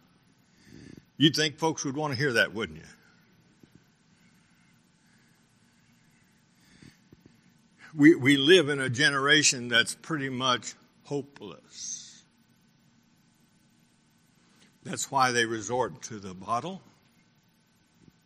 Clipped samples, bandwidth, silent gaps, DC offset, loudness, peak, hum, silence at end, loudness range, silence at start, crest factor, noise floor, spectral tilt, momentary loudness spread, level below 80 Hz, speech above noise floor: under 0.1%; 14 kHz; none; under 0.1%; -25 LUFS; -6 dBFS; none; 1.45 s; 19 LU; 0.8 s; 24 dB; -66 dBFS; -3.5 dB/octave; 21 LU; -70 dBFS; 40 dB